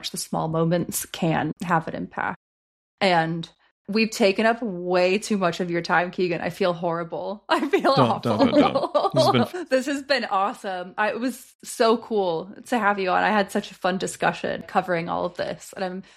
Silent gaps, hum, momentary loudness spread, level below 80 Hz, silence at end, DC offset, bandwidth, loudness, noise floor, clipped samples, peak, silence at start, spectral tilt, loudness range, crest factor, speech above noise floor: 2.36-2.98 s, 3.71-3.85 s, 11.55-11.59 s; none; 11 LU; -62 dBFS; 0.15 s; under 0.1%; 15.5 kHz; -23 LUFS; under -90 dBFS; under 0.1%; -4 dBFS; 0 s; -5 dB/octave; 4 LU; 18 dB; over 67 dB